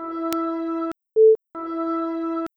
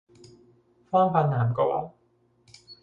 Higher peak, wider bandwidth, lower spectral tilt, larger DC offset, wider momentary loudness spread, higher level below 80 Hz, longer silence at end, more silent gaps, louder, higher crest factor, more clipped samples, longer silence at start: first, -2 dBFS vs -8 dBFS; first, over 20 kHz vs 7.4 kHz; second, -5 dB/octave vs -9 dB/octave; neither; about the same, 11 LU vs 9 LU; about the same, -68 dBFS vs -64 dBFS; about the same, 0.1 s vs 0.1 s; neither; first, -22 LUFS vs -25 LUFS; about the same, 20 dB vs 20 dB; neither; second, 0 s vs 0.9 s